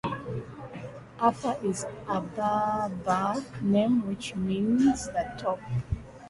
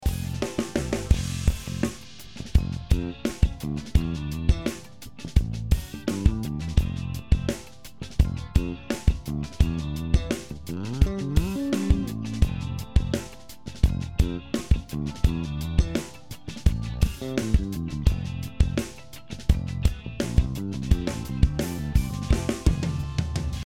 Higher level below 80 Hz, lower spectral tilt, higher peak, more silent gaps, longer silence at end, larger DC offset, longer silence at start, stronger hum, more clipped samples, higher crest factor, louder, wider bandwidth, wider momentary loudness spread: second, -50 dBFS vs -28 dBFS; about the same, -6 dB/octave vs -6.5 dB/octave; second, -10 dBFS vs -4 dBFS; neither; about the same, 0 s vs 0 s; neither; about the same, 0.05 s vs 0 s; neither; neither; about the same, 18 dB vs 22 dB; about the same, -29 LUFS vs -27 LUFS; second, 11.5 kHz vs 16 kHz; first, 13 LU vs 8 LU